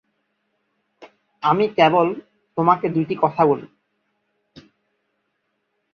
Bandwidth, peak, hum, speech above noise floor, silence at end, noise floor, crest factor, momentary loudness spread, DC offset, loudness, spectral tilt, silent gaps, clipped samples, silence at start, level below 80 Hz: 6.6 kHz; -2 dBFS; none; 55 dB; 2.3 s; -73 dBFS; 20 dB; 9 LU; under 0.1%; -19 LUFS; -8 dB/octave; none; under 0.1%; 1 s; -66 dBFS